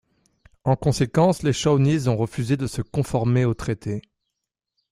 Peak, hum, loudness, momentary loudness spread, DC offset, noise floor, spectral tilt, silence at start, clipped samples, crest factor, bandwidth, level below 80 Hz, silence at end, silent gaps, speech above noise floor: -4 dBFS; none; -22 LUFS; 9 LU; under 0.1%; -82 dBFS; -6.5 dB/octave; 0.65 s; under 0.1%; 18 dB; 13.5 kHz; -46 dBFS; 0.9 s; none; 61 dB